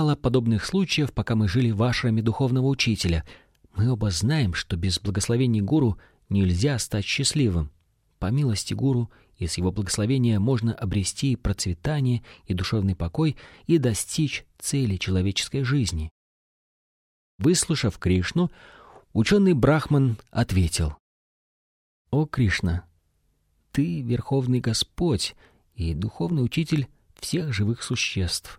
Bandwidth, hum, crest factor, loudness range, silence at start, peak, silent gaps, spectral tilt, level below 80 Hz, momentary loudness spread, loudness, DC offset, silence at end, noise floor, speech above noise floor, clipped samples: 15.5 kHz; none; 18 dB; 4 LU; 0 s; -8 dBFS; 16.11-17.39 s, 20.99-22.05 s; -5.5 dB/octave; -42 dBFS; 7 LU; -24 LUFS; under 0.1%; 0.05 s; -68 dBFS; 45 dB; under 0.1%